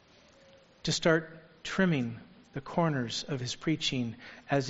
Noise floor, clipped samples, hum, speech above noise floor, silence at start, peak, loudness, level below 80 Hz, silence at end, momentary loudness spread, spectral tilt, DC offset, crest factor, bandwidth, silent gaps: -59 dBFS; under 0.1%; none; 29 dB; 0.85 s; -10 dBFS; -31 LUFS; -60 dBFS; 0 s; 16 LU; -4.5 dB/octave; under 0.1%; 22 dB; 8 kHz; none